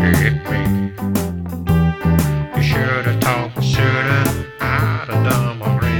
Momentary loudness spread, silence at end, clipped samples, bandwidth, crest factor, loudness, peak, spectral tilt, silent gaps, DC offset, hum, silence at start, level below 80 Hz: 5 LU; 0 s; under 0.1%; 19 kHz; 16 dB; -17 LUFS; 0 dBFS; -6 dB/octave; none; under 0.1%; none; 0 s; -32 dBFS